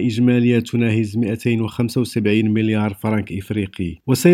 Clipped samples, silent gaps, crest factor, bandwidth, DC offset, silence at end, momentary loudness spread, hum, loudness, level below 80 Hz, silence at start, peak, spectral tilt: under 0.1%; none; 16 dB; 16 kHz; under 0.1%; 0 s; 8 LU; none; -19 LUFS; -52 dBFS; 0 s; 0 dBFS; -7 dB/octave